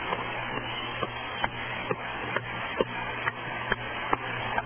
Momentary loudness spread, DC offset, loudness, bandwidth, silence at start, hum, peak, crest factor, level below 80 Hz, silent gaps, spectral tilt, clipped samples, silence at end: 3 LU; under 0.1%; -31 LUFS; 3.5 kHz; 0 s; none; -8 dBFS; 26 dB; -52 dBFS; none; -2 dB/octave; under 0.1%; 0 s